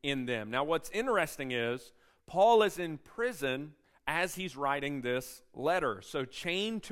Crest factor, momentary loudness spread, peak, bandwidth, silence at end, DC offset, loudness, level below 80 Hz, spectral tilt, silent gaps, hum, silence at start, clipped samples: 18 dB; 12 LU; -14 dBFS; 16 kHz; 0 s; under 0.1%; -32 LUFS; -62 dBFS; -4 dB/octave; none; none; 0.05 s; under 0.1%